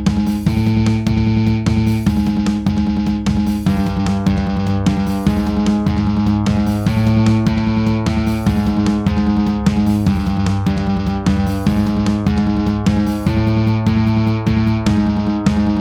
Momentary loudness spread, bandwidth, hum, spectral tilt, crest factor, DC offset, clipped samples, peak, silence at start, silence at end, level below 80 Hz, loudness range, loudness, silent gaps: 2 LU; 14.5 kHz; none; -7.5 dB/octave; 14 dB; under 0.1%; under 0.1%; 0 dBFS; 0 s; 0 s; -28 dBFS; 1 LU; -16 LUFS; none